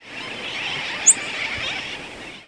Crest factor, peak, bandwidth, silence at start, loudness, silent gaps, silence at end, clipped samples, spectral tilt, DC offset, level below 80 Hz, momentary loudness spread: 24 dB; 0 dBFS; 11 kHz; 0 s; -20 LUFS; none; 0.05 s; under 0.1%; 0.5 dB/octave; under 0.1%; -56 dBFS; 16 LU